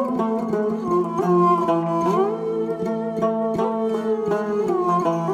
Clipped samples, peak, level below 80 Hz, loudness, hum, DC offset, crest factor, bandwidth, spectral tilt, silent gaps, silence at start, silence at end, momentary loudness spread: under 0.1%; -6 dBFS; -60 dBFS; -21 LUFS; none; under 0.1%; 14 dB; 12 kHz; -8 dB/octave; none; 0 s; 0 s; 6 LU